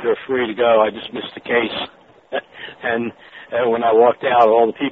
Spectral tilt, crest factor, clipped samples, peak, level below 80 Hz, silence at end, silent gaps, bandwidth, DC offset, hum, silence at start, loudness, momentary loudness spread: -2 dB/octave; 16 dB; under 0.1%; -2 dBFS; -60 dBFS; 0 s; none; 4.7 kHz; under 0.1%; none; 0 s; -18 LUFS; 15 LU